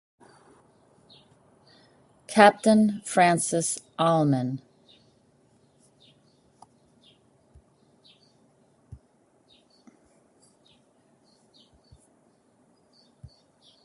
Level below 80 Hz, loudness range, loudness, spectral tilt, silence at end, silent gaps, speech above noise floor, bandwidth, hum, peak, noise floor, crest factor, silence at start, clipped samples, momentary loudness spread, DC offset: -66 dBFS; 8 LU; -22 LUFS; -5 dB/octave; 4.9 s; none; 43 dB; 11.5 kHz; none; -2 dBFS; -64 dBFS; 28 dB; 2.3 s; under 0.1%; 11 LU; under 0.1%